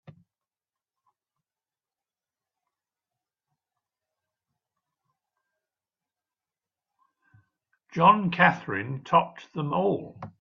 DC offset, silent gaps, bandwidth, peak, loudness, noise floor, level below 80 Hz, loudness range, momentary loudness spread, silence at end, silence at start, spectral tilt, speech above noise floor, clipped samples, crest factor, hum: under 0.1%; none; 7 kHz; -4 dBFS; -24 LUFS; under -90 dBFS; -70 dBFS; 4 LU; 15 LU; 0.1 s; 7.95 s; -7.5 dB/octave; over 66 dB; under 0.1%; 26 dB; none